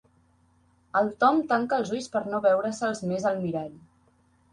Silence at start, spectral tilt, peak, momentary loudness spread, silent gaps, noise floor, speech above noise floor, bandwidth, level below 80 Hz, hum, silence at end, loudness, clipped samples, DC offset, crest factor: 0.95 s; -5.5 dB/octave; -8 dBFS; 8 LU; none; -64 dBFS; 38 dB; 11.5 kHz; -66 dBFS; none; 0.75 s; -26 LUFS; under 0.1%; under 0.1%; 18 dB